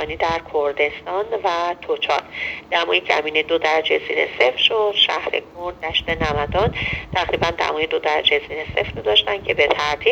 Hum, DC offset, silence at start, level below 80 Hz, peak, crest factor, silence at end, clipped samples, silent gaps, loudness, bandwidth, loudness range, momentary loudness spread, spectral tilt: none; under 0.1%; 0 s; -42 dBFS; 0 dBFS; 20 dB; 0 s; under 0.1%; none; -19 LUFS; 8.2 kHz; 3 LU; 7 LU; -4 dB/octave